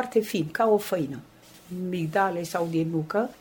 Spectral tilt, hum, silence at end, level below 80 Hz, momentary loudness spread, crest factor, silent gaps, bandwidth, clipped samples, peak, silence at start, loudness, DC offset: -6 dB/octave; none; 0.05 s; -66 dBFS; 11 LU; 16 dB; none; over 20 kHz; under 0.1%; -10 dBFS; 0 s; -27 LUFS; under 0.1%